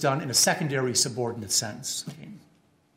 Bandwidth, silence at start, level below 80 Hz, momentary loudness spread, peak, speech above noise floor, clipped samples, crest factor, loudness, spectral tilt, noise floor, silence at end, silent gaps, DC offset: 16 kHz; 0 s; -72 dBFS; 12 LU; -8 dBFS; 36 dB; under 0.1%; 20 dB; -25 LUFS; -2.5 dB/octave; -63 dBFS; 0.6 s; none; under 0.1%